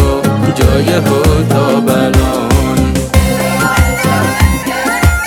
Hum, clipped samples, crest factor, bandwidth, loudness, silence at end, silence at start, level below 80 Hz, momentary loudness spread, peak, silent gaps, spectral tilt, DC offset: none; 0.7%; 10 dB; 18.5 kHz; -11 LUFS; 0 s; 0 s; -20 dBFS; 2 LU; 0 dBFS; none; -5.5 dB/octave; under 0.1%